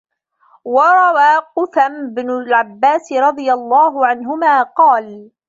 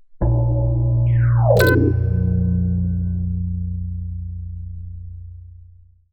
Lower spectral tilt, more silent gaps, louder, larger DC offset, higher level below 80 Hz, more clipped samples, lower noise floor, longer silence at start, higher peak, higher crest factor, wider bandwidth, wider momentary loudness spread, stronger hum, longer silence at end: second, -4 dB/octave vs -7.5 dB/octave; neither; first, -13 LUFS vs -19 LUFS; neither; second, -70 dBFS vs -28 dBFS; neither; first, -54 dBFS vs -47 dBFS; first, 0.65 s vs 0.1 s; about the same, -2 dBFS vs -2 dBFS; about the same, 12 dB vs 16 dB; first, 7.8 kHz vs 6.2 kHz; second, 9 LU vs 19 LU; second, none vs 60 Hz at -50 dBFS; second, 0.25 s vs 0.5 s